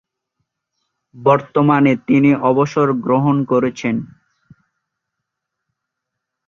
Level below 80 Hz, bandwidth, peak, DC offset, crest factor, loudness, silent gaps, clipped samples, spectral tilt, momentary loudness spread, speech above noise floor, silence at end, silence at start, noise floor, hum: -58 dBFS; 7.2 kHz; -2 dBFS; under 0.1%; 16 dB; -15 LUFS; none; under 0.1%; -8 dB/octave; 6 LU; 65 dB; 2.45 s; 1.15 s; -79 dBFS; none